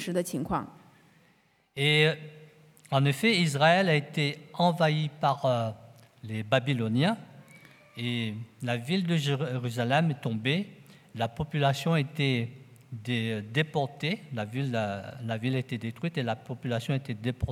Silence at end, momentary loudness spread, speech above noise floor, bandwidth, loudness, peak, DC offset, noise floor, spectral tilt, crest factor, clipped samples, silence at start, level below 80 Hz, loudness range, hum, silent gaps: 0 s; 13 LU; 38 dB; 15.5 kHz; -29 LUFS; -8 dBFS; under 0.1%; -66 dBFS; -6 dB/octave; 22 dB; under 0.1%; 0 s; -58 dBFS; 6 LU; none; none